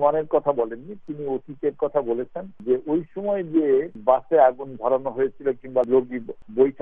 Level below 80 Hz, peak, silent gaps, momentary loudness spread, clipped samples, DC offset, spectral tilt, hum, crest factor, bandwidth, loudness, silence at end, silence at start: -60 dBFS; -4 dBFS; none; 13 LU; under 0.1%; under 0.1%; -10 dB/octave; none; 18 dB; 3.7 kHz; -23 LUFS; 0 s; 0 s